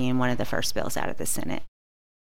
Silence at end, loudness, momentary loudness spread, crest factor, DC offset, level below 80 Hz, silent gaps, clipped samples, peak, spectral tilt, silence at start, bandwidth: 0.65 s; -29 LUFS; 7 LU; 18 dB; 5%; -46 dBFS; none; under 0.1%; -12 dBFS; -4 dB/octave; 0 s; 16.5 kHz